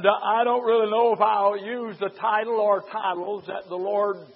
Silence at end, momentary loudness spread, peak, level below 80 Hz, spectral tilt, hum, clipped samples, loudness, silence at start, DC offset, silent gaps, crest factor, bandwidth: 0.1 s; 11 LU; -4 dBFS; -82 dBFS; -9 dB/octave; none; under 0.1%; -23 LUFS; 0 s; under 0.1%; none; 20 dB; 5.6 kHz